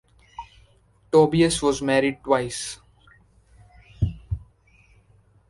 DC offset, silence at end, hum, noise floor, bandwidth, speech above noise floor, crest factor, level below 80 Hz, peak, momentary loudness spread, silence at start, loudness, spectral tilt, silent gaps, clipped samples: under 0.1%; 1.1 s; none; -58 dBFS; 11.5 kHz; 37 dB; 22 dB; -42 dBFS; -4 dBFS; 24 LU; 0.4 s; -22 LUFS; -5 dB/octave; none; under 0.1%